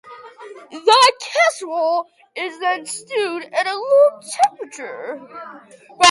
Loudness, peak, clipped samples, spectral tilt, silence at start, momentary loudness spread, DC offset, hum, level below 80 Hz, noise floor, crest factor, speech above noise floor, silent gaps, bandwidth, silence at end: -17 LUFS; 0 dBFS; under 0.1%; 0 dB/octave; 0.05 s; 22 LU; under 0.1%; none; -68 dBFS; -39 dBFS; 18 dB; 20 dB; none; 11.5 kHz; 0 s